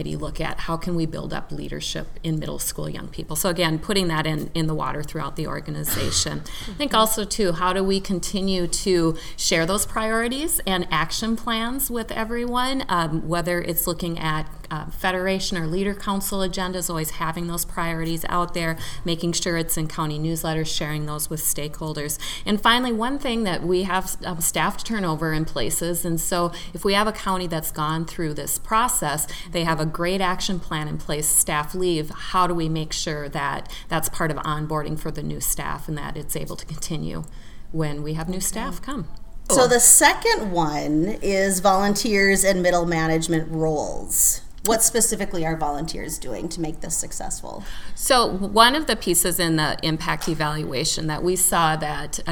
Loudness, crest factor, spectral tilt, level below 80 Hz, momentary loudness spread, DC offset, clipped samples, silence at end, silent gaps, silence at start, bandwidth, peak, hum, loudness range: -22 LUFS; 22 dB; -3 dB/octave; -36 dBFS; 12 LU; under 0.1%; under 0.1%; 0 s; none; 0 s; 19 kHz; 0 dBFS; none; 8 LU